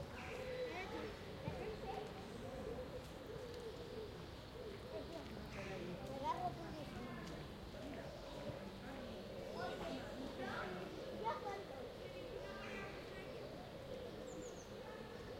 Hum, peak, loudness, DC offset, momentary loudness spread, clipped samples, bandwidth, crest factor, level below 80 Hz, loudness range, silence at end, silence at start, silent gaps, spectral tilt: none; -30 dBFS; -49 LUFS; under 0.1%; 6 LU; under 0.1%; 16 kHz; 18 dB; -62 dBFS; 3 LU; 0 s; 0 s; none; -5.5 dB/octave